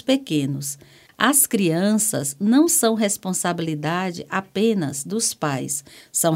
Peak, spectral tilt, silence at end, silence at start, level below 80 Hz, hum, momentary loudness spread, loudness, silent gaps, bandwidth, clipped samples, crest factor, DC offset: 0 dBFS; -3.5 dB/octave; 0 s; 0.05 s; -66 dBFS; none; 10 LU; -21 LUFS; none; 16.5 kHz; under 0.1%; 22 dB; under 0.1%